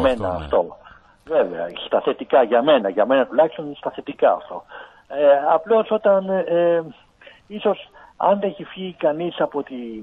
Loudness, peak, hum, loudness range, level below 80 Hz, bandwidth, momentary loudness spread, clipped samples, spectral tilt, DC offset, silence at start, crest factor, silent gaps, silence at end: -20 LUFS; -4 dBFS; none; 3 LU; -50 dBFS; 4.8 kHz; 15 LU; under 0.1%; -7.5 dB/octave; under 0.1%; 0 s; 16 dB; none; 0 s